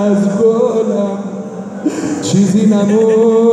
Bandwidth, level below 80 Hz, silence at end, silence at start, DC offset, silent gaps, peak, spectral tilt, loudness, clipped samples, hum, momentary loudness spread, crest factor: 10.5 kHz; -58 dBFS; 0 s; 0 s; under 0.1%; none; -2 dBFS; -7 dB/octave; -13 LUFS; under 0.1%; none; 12 LU; 10 dB